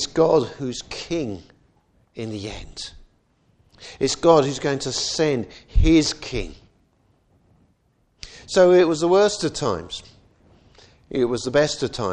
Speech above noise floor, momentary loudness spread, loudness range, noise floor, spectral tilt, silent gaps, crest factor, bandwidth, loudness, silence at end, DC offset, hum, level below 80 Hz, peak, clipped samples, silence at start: 44 dB; 19 LU; 7 LU; -64 dBFS; -4.5 dB/octave; none; 20 dB; 10 kHz; -21 LUFS; 0 s; under 0.1%; none; -34 dBFS; -2 dBFS; under 0.1%; 0 s